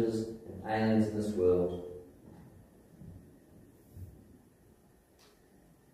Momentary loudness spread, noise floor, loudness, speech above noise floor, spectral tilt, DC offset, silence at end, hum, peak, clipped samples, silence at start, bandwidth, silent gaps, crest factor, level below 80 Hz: 26 LU; -63 dBFS; -32 LUFS; 33 dB; -7.5 dB/octave; under 0.1%; 1.85 s; none; -16 dBFS; under 0.1%; 0 s; 14.5 kHz; none; 18 dB; -62 dBFS